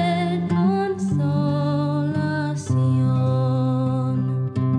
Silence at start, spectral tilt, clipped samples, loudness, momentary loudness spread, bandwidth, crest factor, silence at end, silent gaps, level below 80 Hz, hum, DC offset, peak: 0 s; -8 dB/octave; under 0.1%; -22 LUFS; 4 LU; 10 kHz; 10 dB; 0 s; none; -58 dBFS; none; under 0.1%; -10 dBFS